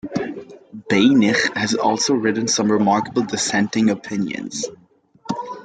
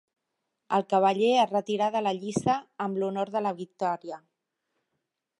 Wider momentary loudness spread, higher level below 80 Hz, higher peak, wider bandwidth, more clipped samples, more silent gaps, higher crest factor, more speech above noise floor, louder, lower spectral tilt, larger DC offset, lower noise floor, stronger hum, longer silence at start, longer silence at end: first, 14 LU vs 10 LU; first, -60 dBFS vs -70 dBFS; first, -4 dBFS vs -10 dBFS; second, 9.4 kHz vs 11 kHz; neither; neither; about the same, 16 dB vs 18 dB; second, 32 dB vs 56 dB; first, -19 LUFS vs -27 LUFS; second, -4 dB/octave vs -5.5 dB/octave; neither; second, -50 dBFS vs -82 dBFS; neither; second, 0.05 s vs 0.7 s; second, 0 s vs 1.2 s